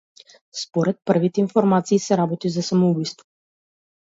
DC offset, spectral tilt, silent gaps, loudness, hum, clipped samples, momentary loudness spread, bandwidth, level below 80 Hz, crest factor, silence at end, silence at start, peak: under 0.1%; -6.5 dB/octave; none; -21 LUFS; none; under 0.1%; 9 LU; 8 kHz; -66 dBFS; 18 dB; 1 s; 0.55 s; -4 dBFS